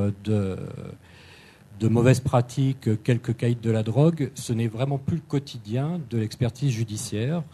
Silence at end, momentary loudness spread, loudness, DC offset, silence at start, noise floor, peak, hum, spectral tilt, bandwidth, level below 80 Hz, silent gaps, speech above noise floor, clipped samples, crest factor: 0.05 s; 9 LU; -25 LUFS; under 0.1%; 0 s; -49 dBFS; -4 dBFS; none; -7 dB/octave; 13.5 kHz; -56 dBFS; none; 25 dB; under 0.1%; 20 dB